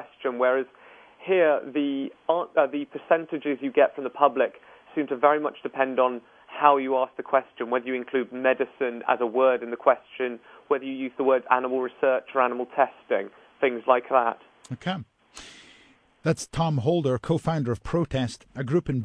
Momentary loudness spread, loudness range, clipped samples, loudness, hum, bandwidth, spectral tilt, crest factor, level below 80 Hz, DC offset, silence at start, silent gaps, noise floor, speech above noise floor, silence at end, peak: 11 LU; 4 LU; under 0.1%; -25 LUFS; none; 11 kHz; -6.5 dB/octave; 24 dB; -56 dBFS; under 0.1%; 0 s; none; -58 dBFS; 33 dB; 0 s; -2 dBFS